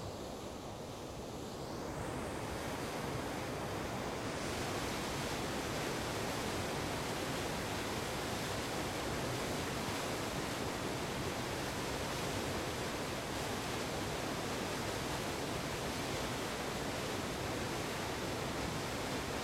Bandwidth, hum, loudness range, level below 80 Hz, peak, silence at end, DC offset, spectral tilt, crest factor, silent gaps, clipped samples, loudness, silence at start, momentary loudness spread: 16.5 kHz; none; 2 LU; -54 dBFS; -26 dBFS; 0 s; under 0.1%; -4 dB/octave; 14 dB; none; under 0.1%; -39 LUFS; 0 s; 3 LU